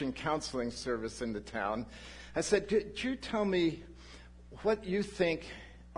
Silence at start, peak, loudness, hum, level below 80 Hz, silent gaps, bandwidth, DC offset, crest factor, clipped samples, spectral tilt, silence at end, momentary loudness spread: 0 s; -14 dBFS; -34 LUFS; 60 Hz at -55 dBFS; -54 dBFS; none; 11 kHz; under 0.1%; 20 dB; under 0.1%; -4.5 dB/octave; 0 s; 18 LU